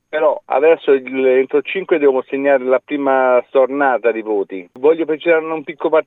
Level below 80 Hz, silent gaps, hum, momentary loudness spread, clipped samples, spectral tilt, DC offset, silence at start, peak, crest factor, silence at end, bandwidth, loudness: -76 dBFS; none; none; 6 LU; under 0.1%; -7.5 dB/octave; under 0.1%; 0.1 s; -2 dBFS; 14 dB; 0.05 s; 4 kHz; -16 LUFS